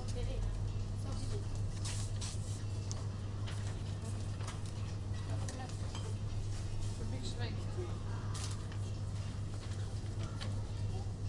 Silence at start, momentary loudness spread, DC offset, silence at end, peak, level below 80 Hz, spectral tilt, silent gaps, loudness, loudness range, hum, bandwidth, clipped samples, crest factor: 0 s; 2 LU; under 0.1%; 0 s; -22 dBFS; -46 dBFS; -5.5 dB/octave; none; -41 LUFS; 1 LU; none; 11.5 kHz; under 0.1%; 16 dB